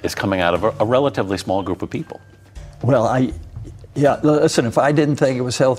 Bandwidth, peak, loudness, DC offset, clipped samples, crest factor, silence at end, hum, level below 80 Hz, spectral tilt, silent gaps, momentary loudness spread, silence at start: 16 kHz; -2 dBFS; -18 LUFS; under 0.1%; under 0.1%; 16 dB; 0 s; none; -44 dBFS; -6 dB/octave; none; 14 LU; 0 s